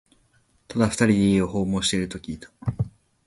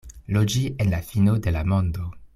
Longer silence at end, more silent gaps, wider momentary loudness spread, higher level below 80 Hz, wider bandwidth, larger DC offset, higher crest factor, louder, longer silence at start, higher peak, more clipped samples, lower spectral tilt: first, 0.35 s vs 0.1 s; neither; first, 13 LU vs 6 LU; second, -46 dBFS vs -38 dBFS; second, 11.5 kHz vs 14.5 kHz; neither; about the same, 18 dB vs 14 dB; about the same, -23 LUFS vs -23 LUFS; first, 0.7 s vs 0.05 s; about the same, -6 dBFS vs -8 dBFS; neither; second, -5 dB/octave vs -6.5 dB/octave